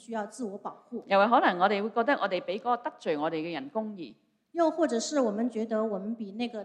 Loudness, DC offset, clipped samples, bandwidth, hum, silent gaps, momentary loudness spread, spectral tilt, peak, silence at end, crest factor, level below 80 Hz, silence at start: -29 LUFS; under 0.1%; under 0.1%; 11 kHz; none; none; 15 LU; -4.5 dB/octave; -8 dBFS; 0 s; 20 dB; -80 dBFS; 0.1 s